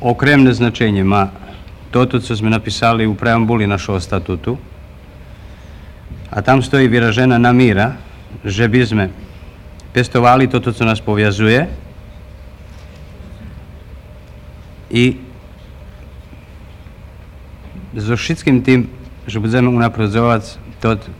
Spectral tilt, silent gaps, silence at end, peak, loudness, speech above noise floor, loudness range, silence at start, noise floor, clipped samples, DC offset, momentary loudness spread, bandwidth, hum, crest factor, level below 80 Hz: -6.5 dB/octave; none; 0 s; 0 dBFS; -14 LUFS; 23 dB; 9 LU; 0 s; -36 dBFS; under 0.1%; under 0.1%; 24 LU; 11.5 kHz; none; 16 dB; -36 dBFS